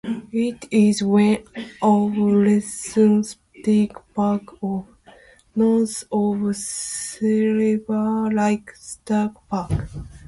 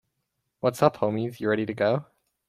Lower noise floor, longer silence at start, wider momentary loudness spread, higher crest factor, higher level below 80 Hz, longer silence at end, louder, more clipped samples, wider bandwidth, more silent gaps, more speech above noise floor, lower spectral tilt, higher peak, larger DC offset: second, -50 dBFS vs -79 dBFS; second, 0.05 s vs 0.65 s; first, 10 LU vs 6 LU; second, 14 dB vs 22 dB; first, -46 dBFS vs -66 dBFS; second, 0.1 s vs 0.45 s; first, -21 LUFS vs -26 LUFS; neither; second, 11.5 kHz vs 15.5 kHz; neither; second, 30 dB vs 54 dB; about the same, -6 dB/octave vs -6.5 dB/octave; about the same, -6 dBFS vs -4 dBFS; neither